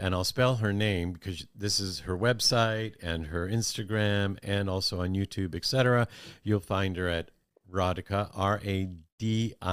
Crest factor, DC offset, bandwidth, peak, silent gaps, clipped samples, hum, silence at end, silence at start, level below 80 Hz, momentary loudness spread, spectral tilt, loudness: 18 dB; under 0.1%; 16 kHz; -12 dBFS; 9.12-9.18 s; under 0.1%; none; 0 s; 0 s; -54 dBFS; 10 LU; -5 dB/octave; -29 LUFS